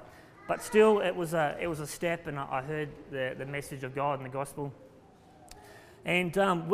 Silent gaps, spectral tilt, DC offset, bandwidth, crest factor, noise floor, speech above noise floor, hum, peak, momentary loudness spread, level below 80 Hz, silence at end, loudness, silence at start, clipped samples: none; -5.5 dB/octave; under 0.1%; 15.5 kHz; 20 dB; -56 dBFS; 26 dB; none; -12 dBFS; 15 LU; -60 dBFS; 0 s; -31 LUFS; 0 s; under 0.1%